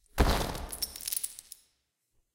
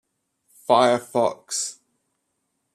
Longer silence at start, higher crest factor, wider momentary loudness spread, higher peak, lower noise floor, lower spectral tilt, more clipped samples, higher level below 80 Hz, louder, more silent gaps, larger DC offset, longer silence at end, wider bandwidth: second, 0.15 s vs 0.7 s; about the same, 24 dB vs 22 dB; first, 20 LU vs 12 LU; second, -10 dBFS vs -4 dBFS; about the same, -77 dBFS vs -75 dBFS; about the same, -3.5 dB/octave vs -3 dB/octave; neither; first, -38 dBFS vs -74 dBFS; second, -32 LUFS vs -22 LUFS; neither; neither; about the same, 0.95 s vs 1 s; first, 17 kHz vs 14 kHz